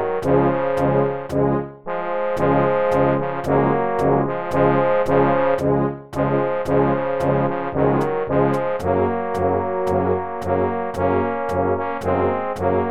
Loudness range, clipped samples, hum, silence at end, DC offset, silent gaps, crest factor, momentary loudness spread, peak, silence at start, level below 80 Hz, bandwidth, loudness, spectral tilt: 3 LU; under 0.1%; none; 0 s; 1%; none; 16 dB; 5 LU; -4 dBFS; 0 s; -44 dBFS; 13.5 kHz; -20 LUFS; -8.5 dB/octave